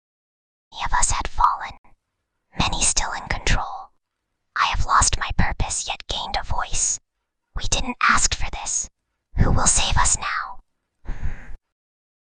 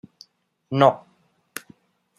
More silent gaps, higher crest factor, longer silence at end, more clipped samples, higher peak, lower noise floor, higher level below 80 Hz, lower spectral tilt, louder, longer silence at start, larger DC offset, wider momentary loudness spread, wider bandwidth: first, 1.78-1.84 s vs none; about the same, 20 dB vs 24 dB; second, 0.85 s vs 1.2 s; neither; about the same, -2 dBFS vs -2 dBFS; first, -77 dBFS vs -55 dBFS; first, -28 dBFS vs -72 dBFS; second, -2 dB/octave vs -6 dB/octave; about the same, -21 LUFS vs -20 LUFS; about the same, 0.75 s vs 0.7 s; neither; about the same, 18 LU vs 20 LU; second, 10 kHz vs 13.5 kHz